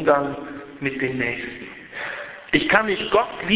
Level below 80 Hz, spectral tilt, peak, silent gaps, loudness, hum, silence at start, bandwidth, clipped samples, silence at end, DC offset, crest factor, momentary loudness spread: -52 dBFS; -8.5 dB/octave; 0 dBFS; none; -22 LUFS; none; 0 s; 4 kHz; under 0.1%; 0 s; under 0.1%; 22 dB; 16 LU